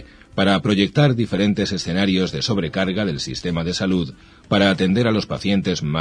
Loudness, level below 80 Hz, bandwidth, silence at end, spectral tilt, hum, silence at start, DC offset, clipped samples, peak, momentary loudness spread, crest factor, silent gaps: -20 LUFS; -46 dBFS; 10.5 kHz; 0 s; -6 dB/octave; none; 0 s; under 0.1%; under 0.1%; 0 dBFS; 7 LU; 20 dB; none